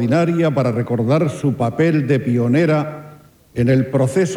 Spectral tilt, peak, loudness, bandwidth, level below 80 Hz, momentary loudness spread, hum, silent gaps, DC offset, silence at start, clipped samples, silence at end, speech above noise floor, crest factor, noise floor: -7.5 dB/octave; -6 dBFS; -17 LUFS; 13 kHz; -52 dBFS; 5 LU; none; none; under 0.1%; 0 s; under 0.1%; 0 s; 27 dB; 12 dB; -43 dBFS